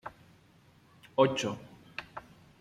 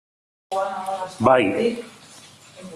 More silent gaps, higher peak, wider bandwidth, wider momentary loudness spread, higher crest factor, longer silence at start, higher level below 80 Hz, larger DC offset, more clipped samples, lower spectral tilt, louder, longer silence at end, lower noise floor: neither; second, -10 dBFS vs -2 dBFS; about the same, 13 kHz vs 13 kHz; about the same, 21 LU vs 19 LU; about the same, 24 dB vs 20 dB; second, 0.05 s vs 0.5 s; second, -70 dBFS vs -60 dBFS; neither; neither; about the same, -5 dB/octave vs -5.5 dB/octave; second, -31 LUFS vs -22 LUFS; first, 0.4 s vs 0 s; first, -62 dBFS vs -47 dBFS